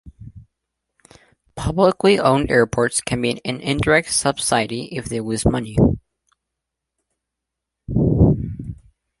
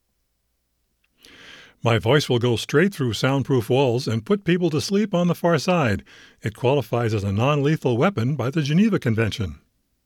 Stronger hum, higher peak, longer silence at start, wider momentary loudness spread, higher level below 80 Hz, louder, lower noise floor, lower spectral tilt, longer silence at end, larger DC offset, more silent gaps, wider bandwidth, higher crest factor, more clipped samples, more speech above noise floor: neither; about the same, -2 dBFS vs -4 dBFS; second, 0.05 s vs 1.45 s; first, 12 LU vs 6 LU; first, -36 dBFS vs -54 dBFS; about the same, -19 LUFS vs -21 LUFS; first, -82 dBFS vs -72 dBFS; second, -5 dB/octave vs -6.5 dB/octave; about the same, 0.45 s vs 0.5 s; neither; neither; second, 11.5 kHz vs 17 kHz; about the same, 18 dB vs 18 dB; neither; first, 64 dB vs 51 dB